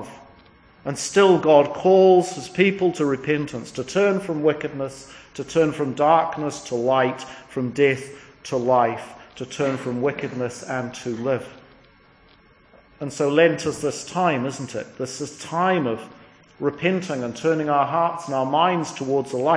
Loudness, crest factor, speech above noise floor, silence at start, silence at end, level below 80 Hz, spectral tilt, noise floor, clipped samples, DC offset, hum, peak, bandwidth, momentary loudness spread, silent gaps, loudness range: -22 LUFS; 20 dB; 33 dB; 0 s; 0 s; -60 dBFS; -5.5 dB/octave; -54 dBFS; under 0.1%; under 0.1%; none; -2 dBFS; 10.5 kHz; 15 LU; none; 8 LU